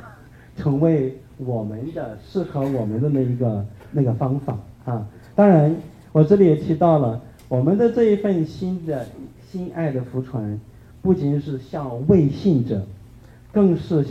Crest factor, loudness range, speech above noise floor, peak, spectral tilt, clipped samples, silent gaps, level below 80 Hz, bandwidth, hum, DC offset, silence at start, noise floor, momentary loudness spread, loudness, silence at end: 18 dB; 7 LU; 25 dB; -2 dBFS; -10 dB/octave; under 0.1%; none; -48 dBFS; 7 kHz; none; under 0.1%; 0 s; -45 dBFS; 14 LU; -21 LUFS; 0 s